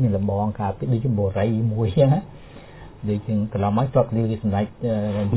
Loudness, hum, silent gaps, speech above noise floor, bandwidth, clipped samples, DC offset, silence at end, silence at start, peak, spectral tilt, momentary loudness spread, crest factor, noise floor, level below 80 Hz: -22 LUFS; none; none; 20 dB; 4 kHz; under 0.1%; under 0.1%; 0 s; 0 s; -4 dBFS; -12.5 dB/octave; 8 LU; 18 dB; -41 dBFS; -42 dBFS